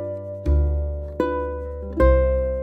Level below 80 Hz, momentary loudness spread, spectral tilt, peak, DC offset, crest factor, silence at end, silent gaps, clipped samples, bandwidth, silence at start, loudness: -24 dBFS; 12 LU; -10 dB/octave; -6 dBFS; under 0.1%; 16 dB; 0 s; none; under 0.1%; 4.2 kHz; 0 s; -23 LUFS